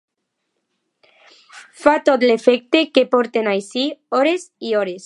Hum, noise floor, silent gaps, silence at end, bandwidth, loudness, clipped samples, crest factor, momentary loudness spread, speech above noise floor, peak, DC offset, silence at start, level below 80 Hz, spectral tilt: none; -75 dBFS; none; 0.05 s; 11 kHz; -17 LUFS; under 0.1%; 18 dB; 7 LU; 58 dB; 0 dBFS; under 0.1%; 1.55 s; -66 dBFS; -4 dB/octave